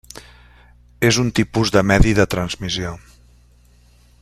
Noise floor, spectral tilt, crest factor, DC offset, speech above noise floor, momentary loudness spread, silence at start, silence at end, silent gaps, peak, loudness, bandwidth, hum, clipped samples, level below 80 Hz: -51 dBFS; -5 dB/octave; 18 dB; under 0.1%; 34 dB; 20 LU; 1 s; 1.25 s; none; -2 dBFS; -18 LUFS; 14.5 kHz; 60 Hz at -35 dBFS; under 0.1%; -30 dBFS